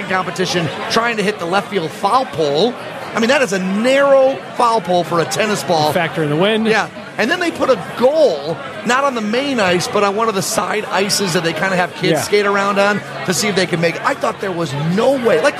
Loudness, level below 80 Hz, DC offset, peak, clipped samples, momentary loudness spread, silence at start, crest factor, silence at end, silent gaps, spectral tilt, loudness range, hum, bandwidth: -16 LUFS; -58 dBFS; under 0.1%; -2 dBFS; under 0.1%; 5 LU; 0 s; 14 dB; 0 s; none; -4 dB/octave; 2 LU; none; 14.5 kHz